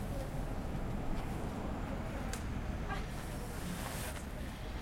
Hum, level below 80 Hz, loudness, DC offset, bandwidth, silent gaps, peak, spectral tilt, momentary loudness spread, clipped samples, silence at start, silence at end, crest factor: none; -44 dBFS; -41 LUFS; under 0.1%; 16.5 kHz; none; -24 dBFS; -5.5 dB/octave; 2 LU; under 0.1%; 0 s; 0 s; 14 dB